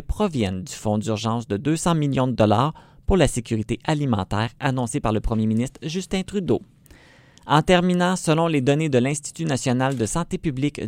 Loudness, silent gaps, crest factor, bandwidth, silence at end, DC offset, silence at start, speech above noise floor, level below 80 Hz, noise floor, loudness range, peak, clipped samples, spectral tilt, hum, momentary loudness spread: -22 LUFS; none; 20 dB; 16 kHz; 0 s; under 0.1%; 0 s; 29 dB; -38 dBFS; -51 dBFS; 3 LU; -2 dBFS; under 0.1%; -5.5 dB/octave; none; 7 LU